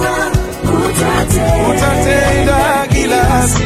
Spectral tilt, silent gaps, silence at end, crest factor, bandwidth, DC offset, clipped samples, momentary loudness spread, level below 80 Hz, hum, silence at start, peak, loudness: -5 dB/octave; none; 0 s; 12 dB; 16 kHz; under 0.1%; under 0.1%; 4 LU; -22 dBFS; none; 0 s; 0 dBFS; -12 LUFS